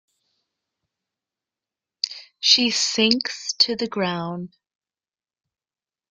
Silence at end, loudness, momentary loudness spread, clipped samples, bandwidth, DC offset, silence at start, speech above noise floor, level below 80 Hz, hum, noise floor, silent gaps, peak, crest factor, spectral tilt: 1.65 s; -20 LUFS; 14 LU; under 0.1%; 12 kHz; under 0.1%; 2.05 s; over 68 dB; -68 dBFS; none; under -90 dBFS; none; -2 dBFS; 24 dB; -2.5 dB/octave